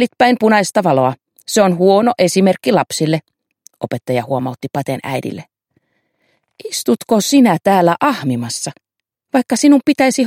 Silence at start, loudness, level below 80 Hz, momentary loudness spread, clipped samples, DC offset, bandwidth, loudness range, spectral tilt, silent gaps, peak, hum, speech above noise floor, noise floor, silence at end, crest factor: 0 s; -15 LUFS; -60 dBFS; 12 LU; under 0.1%; under 0.1%; 16 kHz; 9 LU; -5 dB/octave; none; 0 dBFS; none; 51 dB; -65 dBFS; 0 s; 14 dB